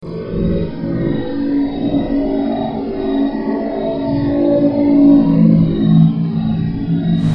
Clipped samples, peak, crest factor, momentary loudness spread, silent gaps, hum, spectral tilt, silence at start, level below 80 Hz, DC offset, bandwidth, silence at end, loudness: under 0.1%; 0 dBFS; 14 dB; 9 LU; none; none; -10.5 dB/octave; 0 s; -34 dBFS; under 0.1%; 5.4 kHz; 0 s; -15 LUFS